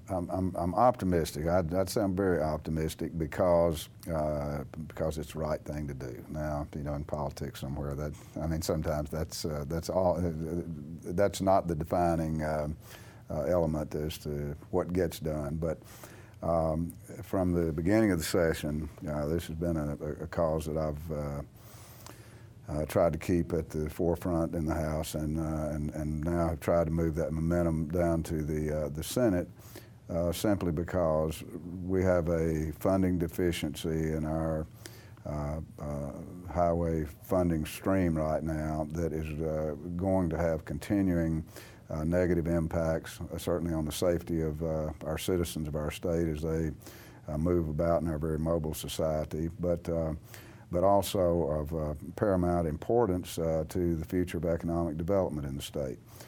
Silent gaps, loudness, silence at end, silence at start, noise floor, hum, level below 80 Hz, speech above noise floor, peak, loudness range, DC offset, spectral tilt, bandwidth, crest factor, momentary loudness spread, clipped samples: none; -32 LUFS; 0 s; 0 s; -51 dBFS; none; -46 dBFS; 20 dB; -12 dBFS; 4 LU; under 0.1%; -7 dB/octave; 19.5 kHz; 20 dB; 11 LU; under 0.1%